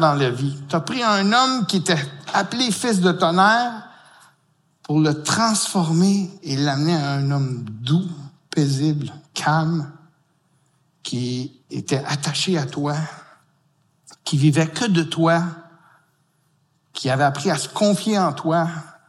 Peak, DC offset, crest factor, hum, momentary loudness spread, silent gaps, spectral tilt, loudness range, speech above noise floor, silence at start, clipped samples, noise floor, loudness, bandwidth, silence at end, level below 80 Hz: -4 dBFS; under 0.1%; 18 dB; none; 11 LU; none; -5 dB/octave; 6 LU; 44 dB; 0 s; under 0.1%; -64 dBFS; -20 LUFS; 12.5 kHz; 0.2 s; -68 dBFS